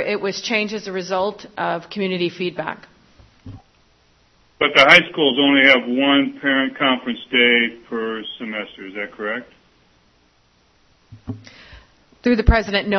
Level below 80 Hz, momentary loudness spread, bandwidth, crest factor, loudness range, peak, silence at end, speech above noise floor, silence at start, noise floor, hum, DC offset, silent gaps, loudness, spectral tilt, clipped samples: -34 dBFS; 18 LU; 12 kHz; 20 dB; 17 LU; 0 dBFS; 0 s; 40 dB; 0 s; -58 dBFS; none; under 0.1%; none; -17 LUFS; -5 dB/octave; under 0.1%